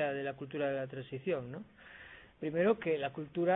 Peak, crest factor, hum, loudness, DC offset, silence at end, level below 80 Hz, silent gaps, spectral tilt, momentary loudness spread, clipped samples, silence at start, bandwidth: -18 dBFS; 18 dB; none; -36 LUFS; under 0.1%; 0 s; -70 dBFS; none; -5 dB/octave; 21 LU; under 0.1%; 0 s; 4 kHz